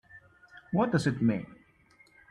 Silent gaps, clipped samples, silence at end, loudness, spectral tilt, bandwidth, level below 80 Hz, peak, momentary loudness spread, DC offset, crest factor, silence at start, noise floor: none; under 0.1%; 0.75 s; -29 LUFS; -7 dB/octave; 11.5 kHz; -62 dBFS; -14 dBFS; 10 LU; under 0.1%; 18 dB; 0.15 s; -62 dBFS